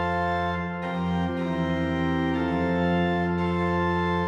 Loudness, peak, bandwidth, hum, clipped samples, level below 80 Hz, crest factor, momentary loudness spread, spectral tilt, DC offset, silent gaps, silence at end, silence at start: -26 LUFS; -14 dBFS; 7.4 kHz; none; under 0.1%; -50 dBFS; 12 dB; 4 LU; -8 dB/octave; under 0.1%; none; 0 s; 0 s